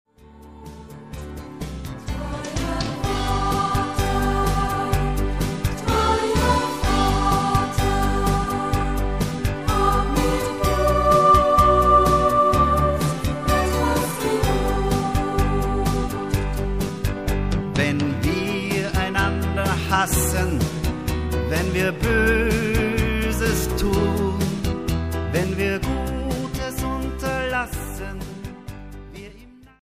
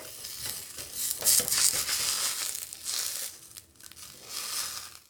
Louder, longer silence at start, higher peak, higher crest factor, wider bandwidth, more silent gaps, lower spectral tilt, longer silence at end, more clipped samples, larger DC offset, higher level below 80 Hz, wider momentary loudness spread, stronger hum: first, -21 LUFS vs -28 LUFS; first, 0.25 s vs 0 s; about the same, -4 dBFS vs -2 dBFS; second, 18 dB vs 30 dB; second, 15.5 kHz vs over 20 kHz; neither; first, -5.5 dB/octave vs 1.5 dB/octave; about the same, 0.15 s vs 0.1 s; neither; first, 0.4% vs under 0.1%; first, -28 dBFS vs -64 dBFS; second, 14 LU vs 22 LU; neither